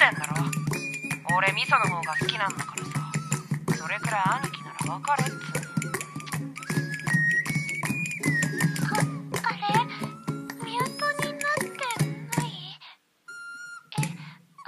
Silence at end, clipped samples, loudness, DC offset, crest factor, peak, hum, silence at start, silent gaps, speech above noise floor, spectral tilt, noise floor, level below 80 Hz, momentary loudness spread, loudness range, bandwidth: 0.05 s; under 0.1%; -27 LUFS; under 0.1%; 24 dB; -4 dBFS; none; 0 s; none; 25 dB; -4 dB/octave; -52 dBFS; -64 dBFS; 12 LU; 4 LU; 14 kHz